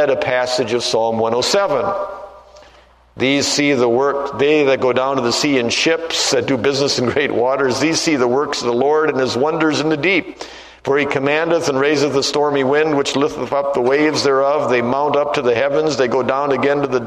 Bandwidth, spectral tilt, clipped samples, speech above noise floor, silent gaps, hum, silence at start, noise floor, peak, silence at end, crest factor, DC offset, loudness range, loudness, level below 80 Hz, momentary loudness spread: 13.5 kHz; -4 dB/octave; under 0.1%; 32 dB; none; none; 0 s; -48 dBFS; 0 dBFS; 0 s; 16 dB; under 0.1%; 2 LU; -16 LUFS; -52 dBFS; 4 LU